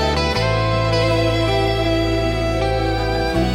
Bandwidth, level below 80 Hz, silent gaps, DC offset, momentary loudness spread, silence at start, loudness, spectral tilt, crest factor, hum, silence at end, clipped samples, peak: 15.5 kHz; -26 dBFS; none; under 0.1%; 3 LU; 0 s; -18 LUFS; -6 dB/octave; 14 dB; none; 0 s; under 0.1%; -4 dBFS